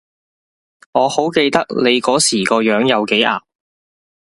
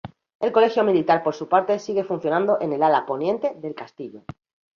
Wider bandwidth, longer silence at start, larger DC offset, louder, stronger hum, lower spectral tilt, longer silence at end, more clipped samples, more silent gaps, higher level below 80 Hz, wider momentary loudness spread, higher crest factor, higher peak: first, 11.5 kHz vs 7 kHz; first, 0.95 s vs 0.05 s; neither; first, -15 LUFS vs -21 LUFS; neither; second, -3 dB/octave vs -6.5 dB/octave; first, 0.95 s vs 0.6 s; neither; second, none vs 0.35-0.40 s; first, -58 dBFS vs -64 dBFS; second, 4 LU vs 17 LU; about the same, 16 dB vs 18 dB; first, 0 dBFS vs -4 dBFS